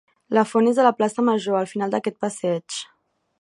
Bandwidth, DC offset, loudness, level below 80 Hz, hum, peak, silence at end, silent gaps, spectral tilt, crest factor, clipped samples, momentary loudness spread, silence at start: 11.5 kHz; under 0.1%; -21 LUFS; -74 dBFS; none; -2 dBFS; 0.6 s; none; -5 dB/octave; 20 dB; under 0.1%; 11 LU; 0.3 s